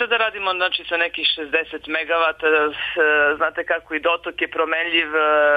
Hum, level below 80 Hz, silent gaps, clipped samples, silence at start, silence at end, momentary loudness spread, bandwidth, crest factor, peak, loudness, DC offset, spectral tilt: none; -56 dBFS; none; under 0.1%; 0 s; 0 s; 6 LU; 5 kHz; 14 dB; -6 dBFS; -19 LUFS; under 0.1%; -4 dB/octave